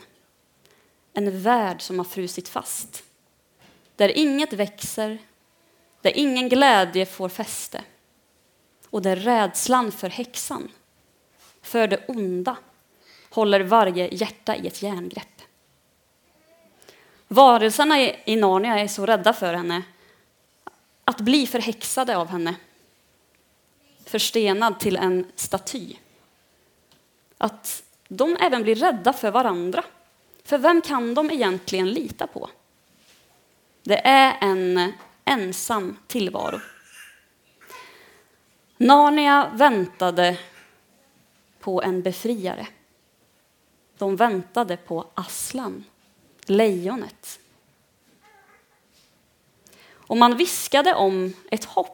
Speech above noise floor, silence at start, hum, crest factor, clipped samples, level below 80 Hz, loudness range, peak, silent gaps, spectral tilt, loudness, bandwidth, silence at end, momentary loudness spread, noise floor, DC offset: 42 dB; 1.15 s; none; 24 dB; under 0.1%; -68 dBFS; 9 LU; 0 dBFS; none; -3.5 dB/octave; -21 LUFS; 19 kHz; 0 s; 17 LU; -63 dBFS; under 0.1%